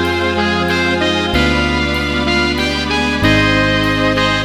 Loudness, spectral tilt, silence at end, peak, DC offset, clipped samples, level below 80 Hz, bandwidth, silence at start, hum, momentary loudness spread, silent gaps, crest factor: -14 LUFS; -5 dB/octave; 0 s; 0 dBFS; under 0.1%; under 0.1%; -26 dBFS; 16.5 kHz; 0 s; none; 3 LU; none; 14 dB